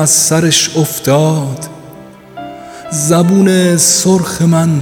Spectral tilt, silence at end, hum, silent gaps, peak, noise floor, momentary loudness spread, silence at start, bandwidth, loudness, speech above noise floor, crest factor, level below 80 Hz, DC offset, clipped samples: -4 dB/octave; 0 s; none; none; 0 dBFS; -34 dBFS; 20 LU; 0 s; 20 kHz; -10 LUFS; 24 dB; 12 dB; -48 dBFS; under 0.1%; under 0.1%